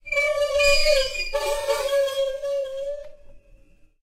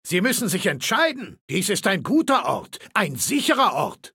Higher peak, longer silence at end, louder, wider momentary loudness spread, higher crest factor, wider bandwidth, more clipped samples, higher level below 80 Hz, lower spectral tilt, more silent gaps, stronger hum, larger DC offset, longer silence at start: about the same, -6 dBFS vs -4 dBFS; first, 0.65 s vs 0.05 s; about the same, -22 LUFS vs -21 LUFS; first, 12 LU vs 8 LU; about the same, 18 dB vs 18 dB; about the same, 16 kHz vs 17 kHz; neither; first, -36 dBFS vs -66 dBFS; second, -0.5 dB/octave vs -3.5 dB/octave; second, none vs 1.41-1.48 s; neither; neither; about the same, 0.05 s vs 0.05 s